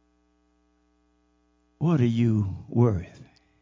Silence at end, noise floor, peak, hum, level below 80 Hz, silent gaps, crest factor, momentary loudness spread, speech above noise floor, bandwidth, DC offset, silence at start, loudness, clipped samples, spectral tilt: 0.4 s; -67 dBFS; -8 dBFS; 60 Hz at -45 dBFS; -48 dBFS; none; 20 dB; 9 LU; 44 dB; 7.4 kHz; under 0.1%; 1.8 s; -25 LUFS; under 0.1%; -9.5 dB/octave